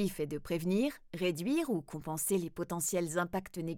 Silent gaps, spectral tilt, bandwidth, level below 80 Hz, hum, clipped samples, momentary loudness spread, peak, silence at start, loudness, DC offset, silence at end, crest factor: none; -5 dB/octave; 20 kHz; -60 dBFS; none; under 0.1%; 6 LU; -20 dBFS; 0 s; -35 LUFS; under 0.1%; 0 s; 16 dB